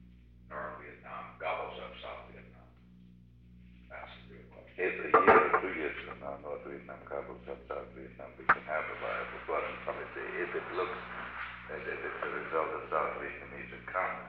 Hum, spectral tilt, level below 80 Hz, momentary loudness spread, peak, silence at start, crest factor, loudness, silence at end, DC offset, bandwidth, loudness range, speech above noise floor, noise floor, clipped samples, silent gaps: 60 Hz at -55 dBFS; -8 dB/octave; -60 dBFS; 18 LU; -10 dBFS; 0 s; 26 dB; -34 LUFS; 0 s; under 0.1%; 5.4 kHz; 14 LU; 20 dB; -57 dBFS; under 0.1%; none